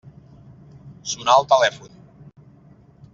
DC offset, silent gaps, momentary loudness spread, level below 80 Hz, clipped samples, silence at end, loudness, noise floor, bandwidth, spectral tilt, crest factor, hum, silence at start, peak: under 0.1%; none; 19 LU; -60 dBFS; under 0.1%; 1.35 s; -18 LUFS; -50 dBFS; 7.8 kHz; -2 dB/octave; 20 dB; none; 0.85 s; -2 dBFS